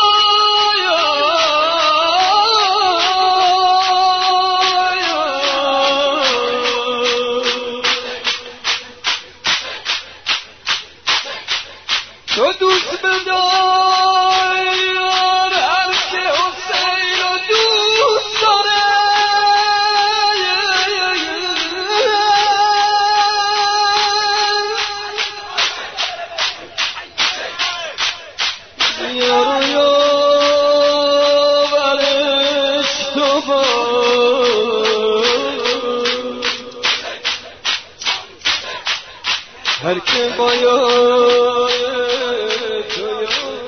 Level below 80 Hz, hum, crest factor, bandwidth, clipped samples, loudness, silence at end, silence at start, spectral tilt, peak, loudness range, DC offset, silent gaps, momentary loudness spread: -56 dBFS; none; 14 dB; 6.6 kHz; under 0.1%; -14 LUFS; 0 s; 0 s; -1 dB/octave; -2 dBFS; 6 LU; 0.2%; none; 8 LU